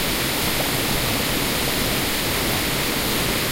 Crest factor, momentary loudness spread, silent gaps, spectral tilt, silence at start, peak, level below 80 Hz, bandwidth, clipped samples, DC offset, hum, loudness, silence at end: 14 dB; 0 LU; none; -3 dB/octave; 0 s; -8 dBFS; -34 dBFS; 16 kHz; under 0.1%; under 0.1%; none; -20 LUFS; 0 s